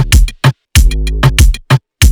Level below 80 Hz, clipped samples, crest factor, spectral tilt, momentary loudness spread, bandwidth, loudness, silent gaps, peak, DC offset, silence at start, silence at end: -10 dBFS; under 0.1%; 8 dB; -4.5 dB/octave; 5 LU; over 20 kHz; -11 LUFS; none; 0 dBFS; under 0.1%; 0 s; 0 s